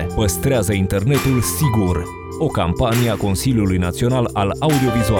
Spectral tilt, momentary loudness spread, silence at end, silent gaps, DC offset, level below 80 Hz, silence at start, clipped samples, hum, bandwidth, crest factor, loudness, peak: -5.5 dB/octave; 4 LU; 0 s; none; 0.1%; -34 dBFS; 0 s; under 0.1%; none; over 20 kHz; 14 dB; -18 LUFS; -4 dBFS